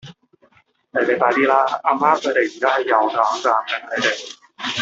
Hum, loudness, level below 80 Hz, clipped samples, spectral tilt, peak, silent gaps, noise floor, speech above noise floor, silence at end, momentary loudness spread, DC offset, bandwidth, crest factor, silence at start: none; -18 LUFS; -68 dBFS; under 0.1%; -3 dB/octave; -2 dBFS; none; -57 dBFS; 39 dB; 0 s; 9 LU; under 0.1%; 8 kHz; 18 dB; 0.05 s